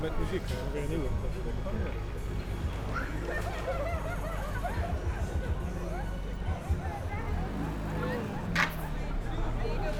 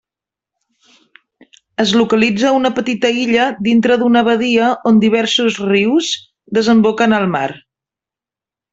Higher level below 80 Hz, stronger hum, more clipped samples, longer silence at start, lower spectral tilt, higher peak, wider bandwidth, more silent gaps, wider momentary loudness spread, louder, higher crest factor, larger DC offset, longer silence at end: first, -36 dBFS vs -56 dBFS; neither; neither; second, 0 s vs 1.8 s; first, -6.5 dB/octave vs -5 dB/octave; second, -12 dBFS vs -2 dBFS; first, 18 kHz vs 8 kHz; neither; about the same, 4 LU vs 6 LU; second, -35 LUFS vs -14 LUFS; first, 20 dB vs 14 dB; neither; second, 0 s vs 1.15 s